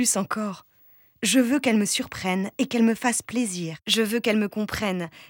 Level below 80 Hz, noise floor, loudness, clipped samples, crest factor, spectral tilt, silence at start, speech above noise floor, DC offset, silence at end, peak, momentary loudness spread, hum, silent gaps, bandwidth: -60 dBFS; -57 dBFS; -24 LUFS; under 0.1%; 16 dB; -3.5 dB/octave; 0 s; 33 dB; under 0.1%; 0.05 s; -8 dBFS; 7 LU; none; none; 19 kHz